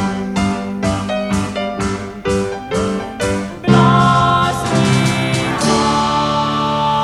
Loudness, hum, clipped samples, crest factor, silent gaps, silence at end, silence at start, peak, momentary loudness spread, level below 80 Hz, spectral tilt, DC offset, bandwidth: -16 LUFS; none; under 0.1%; 16 dB; none; 0 s; 0 s; 0 dBFS; 9 LU; -36 dBFS; -5.5 dB/octave; under 0.1%; 13 kHz